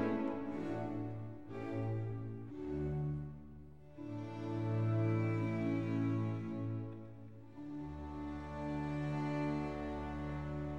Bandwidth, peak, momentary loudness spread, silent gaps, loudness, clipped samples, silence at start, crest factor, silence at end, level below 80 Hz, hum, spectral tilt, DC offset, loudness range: 7.4 kHz; -24 dBFS; 14 LU; none; -40 LUFS; under 0.1%; 0 s; 16 dB; 0 s; -56 dBFS; none; -9 dB/octave; 0.1%; 5 LU